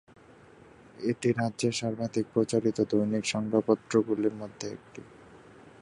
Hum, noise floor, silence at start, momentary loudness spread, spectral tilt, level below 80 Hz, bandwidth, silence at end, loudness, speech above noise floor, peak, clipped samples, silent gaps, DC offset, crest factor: none; -54 dBFS; 1 s; 13 LU; -5.5 dB/octave; -66 dBFS; 11 kHz; 0.15 s; -29 LUFS; 26 dB; -10 dBFS; under 0.1%; none; under 0.1%; 20 dB